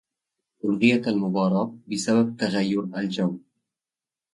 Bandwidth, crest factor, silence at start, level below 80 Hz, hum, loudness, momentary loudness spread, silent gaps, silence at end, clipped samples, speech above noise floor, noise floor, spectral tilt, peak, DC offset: 11.5 kHz; 20 dB; 0.65 s; -68 dBFS; none; -24 LUFS; 9 LU; none; 0.95 s; under 0.1%; over 67 dB; under -90 dBFS; -6 dB/octave; -6 dBFS; under 0.1%